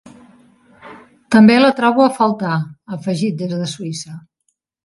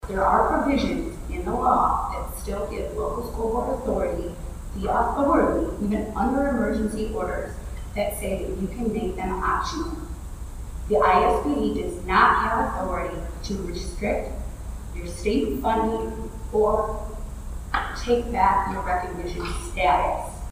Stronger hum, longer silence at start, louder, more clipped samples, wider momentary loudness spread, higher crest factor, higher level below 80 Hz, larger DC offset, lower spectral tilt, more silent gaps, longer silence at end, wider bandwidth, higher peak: neither; first, 0.85 s vs 0 s; first, -15 LUFS vs -24 LUFS; neither; about the same, 17 LU vs 15 LU; second, 16 dB vs 22 dB; second, -58 dBFS vs -34 dBFS; neither; about the same, -6 dB/octave vs -6 dB/octave; neither; first, 0.65 s vs 0 s; second, 11.5 kHz vs 15.5 kHz; about the same, 0 dBFS vs -2 dBFS